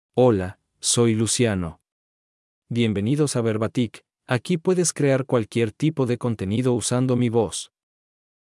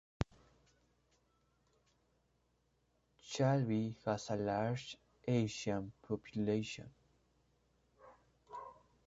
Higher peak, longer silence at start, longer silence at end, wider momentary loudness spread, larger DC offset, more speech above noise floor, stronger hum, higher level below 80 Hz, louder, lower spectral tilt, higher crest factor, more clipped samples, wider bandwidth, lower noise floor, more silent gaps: first, -6 dBFS vs -16 dBFS; about the same, 0.15 s vs 0.2 s; first, 0.9 s vs 0.35 s; second, 8 LU vs 17 LU; neither; first, over 69 dB vs 41 dB; neither; about the same, -62 dBFS vs -64 dBFS; first, -22 LUFS vs -39 LUFS; second, -5 dB/octave vs -6.5 dB/octave; second, 18 dB vs 26 dB; neither; first, 12 kHz vs 8 kHz; first, under -90 dBFS vs -78 dBFS; first, 1.92-2.62 s vs none